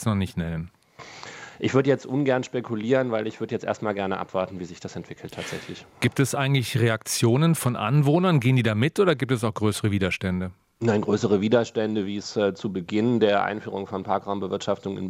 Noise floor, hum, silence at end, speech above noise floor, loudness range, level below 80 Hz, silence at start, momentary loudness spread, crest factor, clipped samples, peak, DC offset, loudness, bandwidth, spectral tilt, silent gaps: -44 dBFS; none; 0 s; 20 dB; 6 LU; -62 dBFS; 0 s; 15 LU; 18 dB; under 0.1%; -6 dBFS; under 0.1%; -24 LUFS; 16 kHz; -6 dB/octave; none